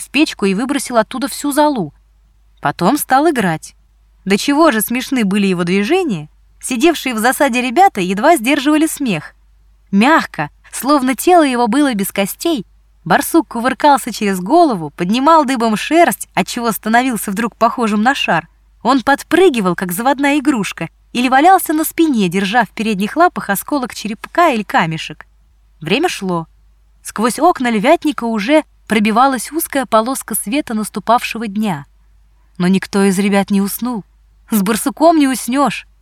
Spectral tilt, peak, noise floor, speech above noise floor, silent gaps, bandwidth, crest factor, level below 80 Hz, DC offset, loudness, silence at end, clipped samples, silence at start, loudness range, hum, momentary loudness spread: -4.5 dB/octave; 0 dBFS; -50 dBFS; 36 dB; none; 18 kHz; 14 dB; -48 dBFS; under 0.1%; -14 LUFS; 0.2 s; under 0.1%; 0 s; 4 LU; none; 10 LU